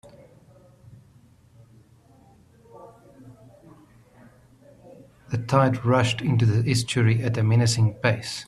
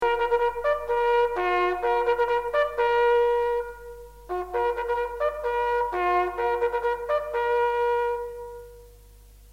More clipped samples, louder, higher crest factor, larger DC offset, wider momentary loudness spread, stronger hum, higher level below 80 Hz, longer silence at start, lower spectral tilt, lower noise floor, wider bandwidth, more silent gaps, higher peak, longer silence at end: neither; first, -22 LUFS vs -25 LUFS; first, 20 dB vs 14 dB; second, under 0.1% vs 0.1%; second, 4 LU vs 12 LU; second, none vs 50 Hz at -50 dBFS; second, -56 dBFS vs -50 dBFS; first, 2.75 s vs 0 s; about the same, -5.5 dB/octave vs -5 dB/octave; first, -55 dBFS vs -50 dBFS; second, 12.5 kHz vs 15.5 kHz; neither; first, -4 dBFS vs -10 dBFS; about the same, 0.05 s vs 0 s